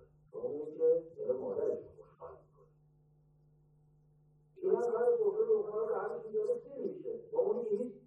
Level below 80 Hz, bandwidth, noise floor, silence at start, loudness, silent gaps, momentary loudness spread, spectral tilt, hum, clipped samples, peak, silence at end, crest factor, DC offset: -76 dBFS; 6 kHz; -67 dBFS; 0.35 s; -35 LUFS; none; 16 LU; -8.5 dB/octave; none; under 0.1%; -18 dBFS; 0.05 s; 18 dB; under 0.1%